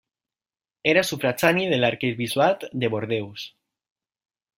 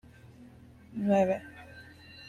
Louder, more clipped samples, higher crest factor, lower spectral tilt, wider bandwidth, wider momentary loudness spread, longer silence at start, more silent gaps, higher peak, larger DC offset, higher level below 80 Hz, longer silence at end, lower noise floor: first, -23 LUFS vs -29 LUFS; neither; about the same, 22 dB vs 20 dB; second, -4.5 dB/octave vs -7.5 dB/octave; first, 16 kHz vs 10.5 kHz; second, 9 LU vs 24 LU; first, 0.85 s vs 0.4 s; neither; first, -4 dBFS vs -14 dBFS; neither; about the same, -64 dBFS vs -64 dBFS; first, 1.1 s vs 0 s; first, under -90 dBFS vs -53 dBFS